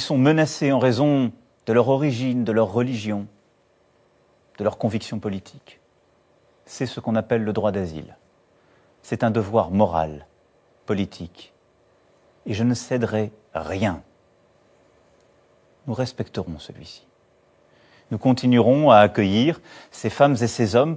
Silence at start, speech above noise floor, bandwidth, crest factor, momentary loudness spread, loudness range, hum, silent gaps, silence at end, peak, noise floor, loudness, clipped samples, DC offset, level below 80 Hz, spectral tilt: 0 s; 40 dB; 8 kHz; 22 dB; 19 LU; 12 LU; none; none; 0 s; -2 dBFS; -61 dBFS; -21 LUFS; under 0.1%; under 0.1%; -50 dBFS; -6.5 dB/octave